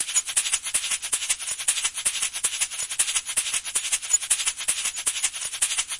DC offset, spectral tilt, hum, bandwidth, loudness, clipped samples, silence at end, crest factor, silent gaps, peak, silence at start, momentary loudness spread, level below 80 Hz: under 0.1%; 3.5 dB/octave; none; 11.5 kHz; -23 LUFS; under 0.1%; 0 s; 20 dB; none; -6 dBFS; 0 s; 3 LU; -60 dBFS